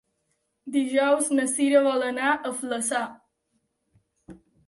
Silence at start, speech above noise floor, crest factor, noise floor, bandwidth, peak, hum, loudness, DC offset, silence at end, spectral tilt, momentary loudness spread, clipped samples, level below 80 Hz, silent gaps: 0.65 s; 51 dB; 18 dB; -75 dBFS; 12 kHz; -8 dBFS; none; -24 LUFS; under 0.1%; 0.3 s; -2 dB/octave; 9 LU; under 0.1%; -70 dBFS; none